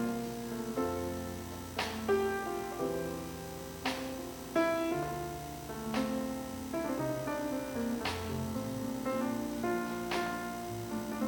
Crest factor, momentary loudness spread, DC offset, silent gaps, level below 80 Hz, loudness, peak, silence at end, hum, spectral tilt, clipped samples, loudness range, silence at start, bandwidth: 16 dB; 9 LU; under 0.1%; none; -56 dBFS; -36 LUFS; -20 dBFS; 0 s; 60 Hz at -55 dBFS; -5 dB/octave; under 0.1%; 1 LU; 0 s; 19 kHz